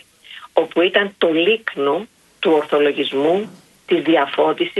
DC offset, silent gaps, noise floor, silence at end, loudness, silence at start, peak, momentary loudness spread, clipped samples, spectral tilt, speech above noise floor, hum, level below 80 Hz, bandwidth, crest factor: under 0.1%; none; -41 dBFS; 0 s; -18 LUFS; 0.3 s; -2 dBFS; 6 LU; under 0.1%; -5.5 dB/octave; 24 dB; none; -66 dBFS; 12 kHz; 18 dB